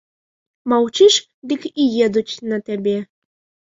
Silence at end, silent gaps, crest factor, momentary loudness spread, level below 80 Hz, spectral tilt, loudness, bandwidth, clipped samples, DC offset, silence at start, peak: 0.65 s; 1.34-1.42 s; 16 dB; 12 LU; -62 dBFS; -3.5 dB/octave; -18 LUFS; 7.8 kHz; under 0.1%; under 0.1%; 0.65 s; -2 dBFS